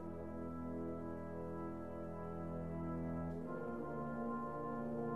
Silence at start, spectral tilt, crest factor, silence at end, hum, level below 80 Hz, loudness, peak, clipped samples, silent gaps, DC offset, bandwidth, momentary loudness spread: 0 s; -10 dB/octave; 14 dB; 0 s; none; -62 dBFS; -45 LUFS; -32 dBFS; under 0.1%; none; 0.2%; 12.5 kHz; 4 LU